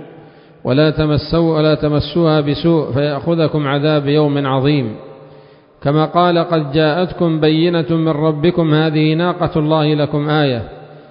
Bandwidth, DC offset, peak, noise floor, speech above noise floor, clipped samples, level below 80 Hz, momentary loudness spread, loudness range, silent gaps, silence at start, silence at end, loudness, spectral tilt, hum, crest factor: 5.4 kHz; under 0.1%; 0 dBFS; -43 dBFS; 29 dB; under 0.1%; -40 dBFS; 4 LU; 2 LU; none; 0 s; 0.1 s; -15 LUFS; -12.5 dB/octave; none; 14 dB